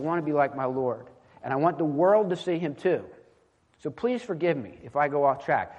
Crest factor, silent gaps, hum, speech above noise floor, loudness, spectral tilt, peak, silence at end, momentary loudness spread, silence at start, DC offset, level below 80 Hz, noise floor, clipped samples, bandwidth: 18 dB; none; none; 38 dB; -26 LUFS; -7.5 dB/octave; -10 dBFS; 0 s; 10 LU; 0 s; under 0.1%; -68 dBFS; -64 dBFS; under 0.1%; 9.2 kHz